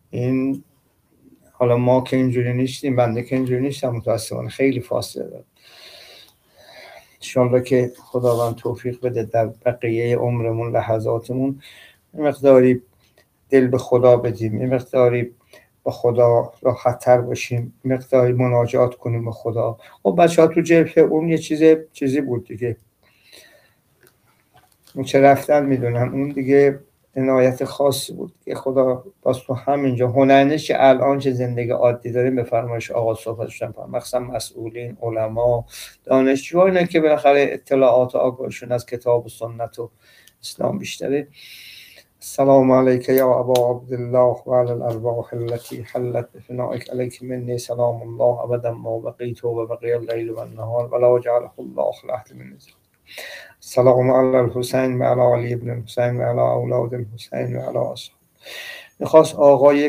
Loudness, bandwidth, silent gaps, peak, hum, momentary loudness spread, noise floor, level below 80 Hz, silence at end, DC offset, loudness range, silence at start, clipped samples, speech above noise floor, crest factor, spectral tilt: -19 LUFS; 16 kHz; none; 0 dBFS; none; 15 LU; -60 dBFS; -56 dBFS; 0 s; under 0.1%; 7 LU; 0.15 s; under 0.1%; 42 dB; 18 dB; -7 dB/octave